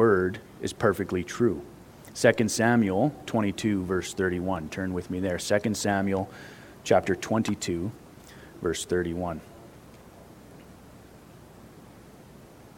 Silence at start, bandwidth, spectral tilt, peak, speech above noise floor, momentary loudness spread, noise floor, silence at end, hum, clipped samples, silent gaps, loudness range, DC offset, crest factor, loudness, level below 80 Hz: 0 s; 17 kHz; -5 dB/octave; -6 dBFS; 23 dB; 20 LU; -50 dBFS; 0 s; none; under 0.1%; none; 9 LU; under 0.1%; 24 dB; -27 LUFS; -58 dBFS